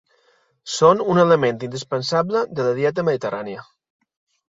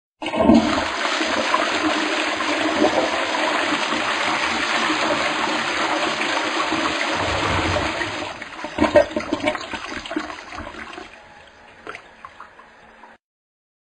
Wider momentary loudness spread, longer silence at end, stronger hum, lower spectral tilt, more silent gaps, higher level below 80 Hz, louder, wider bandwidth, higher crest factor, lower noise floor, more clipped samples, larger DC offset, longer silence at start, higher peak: about the same, 14 LU vs 16 LU; about the same, 0.85 s vs 0.85 s; neither; first, -5.5 dB/octave vs -3.5 dB/octave; neither; second, -62 dBFS vs -46 dBFS; about the same, -19 LUFS vs -20 LUFS; second, 7.8 kHz vs 10.5 kHz; about the same, 18 dB vs 20 dB; first, -61 dBFS vs -47 dBFS; neither; neither; first, 0.65 s vs 0.2 s; about the same, -2 dBFS vs -2 dBFS